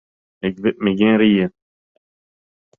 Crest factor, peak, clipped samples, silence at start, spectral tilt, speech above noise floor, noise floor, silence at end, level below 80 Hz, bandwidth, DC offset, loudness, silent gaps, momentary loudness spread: 16 dB; -4 dBFS; under 0.1%; 0.45 s; -9 dB/octave; over 74 dB; under -90 dBFS; 1.3 s; -56 dBFS; 3.8 kHz; under 0.1%; -18 LUFS; none; 12 LU